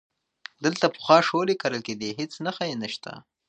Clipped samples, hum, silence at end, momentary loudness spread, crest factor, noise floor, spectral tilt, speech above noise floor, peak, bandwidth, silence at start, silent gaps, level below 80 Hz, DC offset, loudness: under 0.1%; none; 0.3 s; 17 LU; 24 dB; -48 dBFS; -4.5 dB/octave; 23 dB; -2 dBFS; 9.2 kHz; 0.6 s; none; -72 dBFS; under 0.1%; -25 LUFS